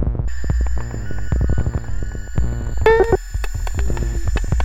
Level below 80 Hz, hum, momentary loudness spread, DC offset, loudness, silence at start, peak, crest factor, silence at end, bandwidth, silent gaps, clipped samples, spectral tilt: -22 dBFS; none; 11 LU; under 0.1%; -21 LUFS; 0 s; -4 dBFS; 14 dB; 0 s; 14.5 kHz; none; under 0.1%; -6.5 dB/octave